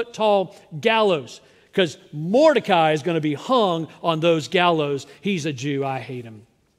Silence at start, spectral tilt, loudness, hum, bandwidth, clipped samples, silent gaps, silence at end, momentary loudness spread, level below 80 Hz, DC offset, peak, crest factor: 0 s; -5.5 dB/octave; -21 LUFS; none; 13 kHz; under 0.1%; none; 0.4 s; 10 LU; -68 dBFS; under 0.1%; -2 dBFS; 20 dB